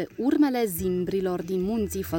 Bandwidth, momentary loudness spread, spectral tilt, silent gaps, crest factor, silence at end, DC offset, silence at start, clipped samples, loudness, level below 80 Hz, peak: 17 kHz; 5 LU; -6 dB/octave; none; 14 dB; 0 s; under 0.1%; 0 s; under 0.1%; -26 LUFS; -48 dBFS; -12 dBFS